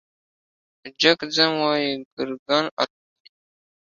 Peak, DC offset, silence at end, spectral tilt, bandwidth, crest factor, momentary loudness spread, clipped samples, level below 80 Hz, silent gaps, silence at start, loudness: -2 dBFS; under 0.1%; 1.1 s; -3.5 dB/octave; 7.6 kHz; 24 dB; 10 LU; under 0.1%; -70 dBFS; 2.05-2.17 s, 2.39-2.46 s, 2.71-2.77 s; 0.85 s; -21 LUFS